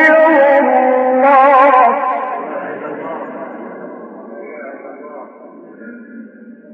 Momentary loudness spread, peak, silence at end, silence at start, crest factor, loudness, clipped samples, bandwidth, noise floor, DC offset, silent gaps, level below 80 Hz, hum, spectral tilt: 24 LU; 0 dBFS; 0.25 s; 0 s; 14 dB; -11 LUFS; under 0.1%; 6 kHz; -37 dBFS; under 0.1%; none; -84 dBFS; none; -6 dB/octave